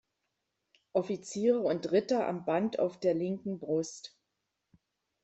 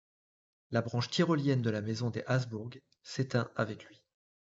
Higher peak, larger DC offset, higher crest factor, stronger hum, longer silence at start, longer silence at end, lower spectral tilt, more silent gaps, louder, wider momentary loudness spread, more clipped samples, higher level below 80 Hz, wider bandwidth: about the same, -16 dBFS vs -16 dBFS; neither; about the same, 18 dB vs 18 dB; neither; first, 0.95 s vs 0.7 s; first, 1.15 s vs 0.6 s; about the same, -6 dB/octave vs -5.5 dB/octave; neither; about the same, -32 LUFS vs -33 LUFS; second, 9 LU vs 13 LU; neither; about the same, -76 dBFS vs -76 dBFS; about the same, 8.2 kHz vs 8 kHz